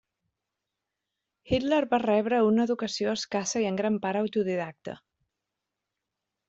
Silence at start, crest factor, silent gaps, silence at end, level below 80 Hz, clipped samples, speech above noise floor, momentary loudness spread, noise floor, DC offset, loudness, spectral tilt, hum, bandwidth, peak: 1.45 s; 18 dB; none; 1.5 s; -58 dBFS; under 0.1%; 59 dB; 11 LU; -86 dBFS; under 0.1%; -27 LUFS; -4.5 dB/octave; none; 8 kHz; -12 dBFS